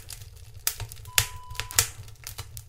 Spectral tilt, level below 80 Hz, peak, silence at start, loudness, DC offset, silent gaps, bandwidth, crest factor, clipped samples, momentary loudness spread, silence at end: 0 dB/octave; -46 dBFS; 0 dBFS; 0 s; -27 LUFS; under 0.1%; none; 16.5 kHz; 32 dB; under 0.1%; 17 LU; 0 s